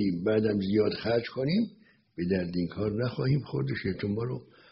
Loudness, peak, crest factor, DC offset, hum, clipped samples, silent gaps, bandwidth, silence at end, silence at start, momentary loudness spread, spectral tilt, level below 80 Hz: -29 LUFS; -14 dBFS; 16 dB; under 0.1%; none; under 0.1%; none; 5.8 kHz; 0.3 s; 0 s; 9 LU; -6.5 dB/octave; -58 dBFS